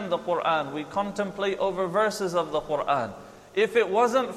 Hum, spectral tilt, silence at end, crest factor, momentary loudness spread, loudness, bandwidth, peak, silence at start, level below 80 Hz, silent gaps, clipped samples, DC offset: none; -4.5 dB/octave; 0 s; 16 dB; 8 LU; -26 LUFS; 14 kHz; -10 dBFS; 0 s; -60 dBFS; none; under 0.1%; under 0.1%